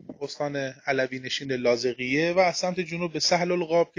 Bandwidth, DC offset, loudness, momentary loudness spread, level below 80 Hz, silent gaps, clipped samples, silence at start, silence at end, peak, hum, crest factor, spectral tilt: 10 kHz; under 0.1%; -26 LUFS; 8 LU; -64 dBFS; none; under 0.1%; 0.1 s; 0.1 s; -8 dBFS; none; 18 dB; -4 dB/octave